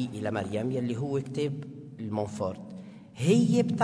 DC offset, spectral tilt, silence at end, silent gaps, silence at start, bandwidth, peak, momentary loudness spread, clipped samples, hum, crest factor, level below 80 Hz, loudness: under 0.1%; -7 dB/octave; 0 s; none; 0 s; 11 kHz; -10 dBFS; 19 LU; under 0.1%; none; 18 dB; -66 dBFS; -29 LUFS